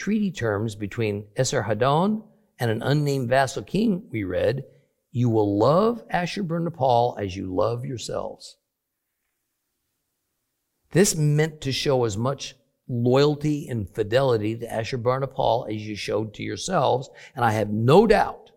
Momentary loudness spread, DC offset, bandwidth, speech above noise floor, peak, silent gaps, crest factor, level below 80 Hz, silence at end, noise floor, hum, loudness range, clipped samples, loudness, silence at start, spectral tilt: 11 LU; under 0.1%; 16.5 kHz; 57 dB; -4 dBFS; none; 20 dB; -50 dBFS; 0.2 s; -80 dBFS; none; 5 LU; under 0.1%; -23 LUFS; 0 s; -5.5 dB/octave